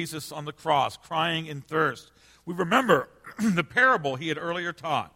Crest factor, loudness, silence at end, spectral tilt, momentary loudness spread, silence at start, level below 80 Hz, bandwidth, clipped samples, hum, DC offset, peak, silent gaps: 20 dB; -26 LUFS; 0.1 s; -4.5 dB/octave; 14 LU; 0 s; -64 dBFS; 16.5 kHz; under 0.1%; none; under 0.1%; -6 dBFS; none